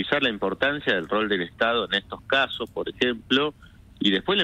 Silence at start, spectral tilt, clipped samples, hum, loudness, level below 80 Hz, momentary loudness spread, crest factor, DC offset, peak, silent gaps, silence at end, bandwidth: 0 s; -5 dB/octave; under 0.1%; none; -24 LUFS; -54 dBFS; 5 LU; 18 dB; under 0.1%; -6 dBFS; none; 0 s; 12.5 kHz